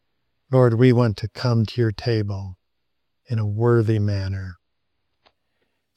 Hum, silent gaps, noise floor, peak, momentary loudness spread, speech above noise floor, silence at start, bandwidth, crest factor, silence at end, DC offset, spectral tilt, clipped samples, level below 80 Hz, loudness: none; none; -79 dBFS; -2 dBFS; 14 LU; 59 dB; 0.5 s; 8.4 kHz; 20 dB; 1.45 s; under 0.1%; -8.5 dB/octave; under 0.1%; -56 dBFS; -21 LUFS